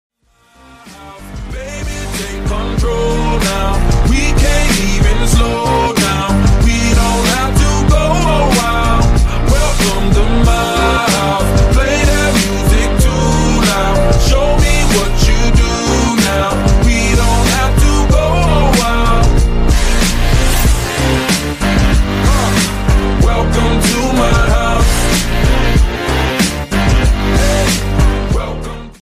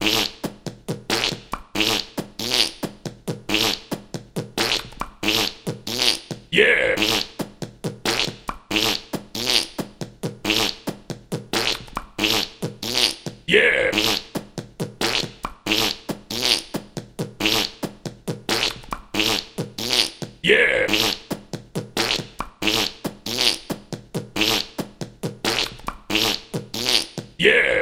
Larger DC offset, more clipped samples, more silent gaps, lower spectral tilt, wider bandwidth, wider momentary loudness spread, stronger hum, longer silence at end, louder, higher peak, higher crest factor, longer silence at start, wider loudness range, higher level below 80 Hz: neither; neither; neither; first, -4.5 dB/octave vs -2.5 dB/octave; about the same, 15.5 kHz vs 17 kHz; second, 4 LU vs 15 LU; neither; about the same, 0.1 s vs 0 s; first, -13 LUFS vs -21 LUFS; about the same, 0 dBFS vs -2 dBFS; second, 10 dB vs 22 dB; first, 0.85 s vs 0 s; about the same, 2 LU vs 4 LU; first, -14 dBFS vs -46 dBFS